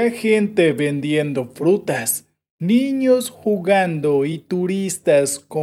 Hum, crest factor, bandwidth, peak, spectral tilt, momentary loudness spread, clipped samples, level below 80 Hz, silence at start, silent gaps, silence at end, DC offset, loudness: none; 14 dB; 15 kHz; -4 dBFS; -5 dB/octave; 5 LU; under 0.1%; -68 dBFS; 0 s; 2.50-2.58 s; 0 s; under 0.1%; -19 LUFS